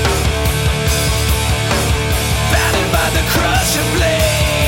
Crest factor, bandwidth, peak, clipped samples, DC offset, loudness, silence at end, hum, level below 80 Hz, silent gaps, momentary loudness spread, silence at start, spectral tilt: 12 dB; 17 kHz; -2 dBFS; under 0.1%; under 0.1%; -14 LUFS; 0 s; none; -20 dBFS; none; 2 LU; 0 s; -4 dB/octave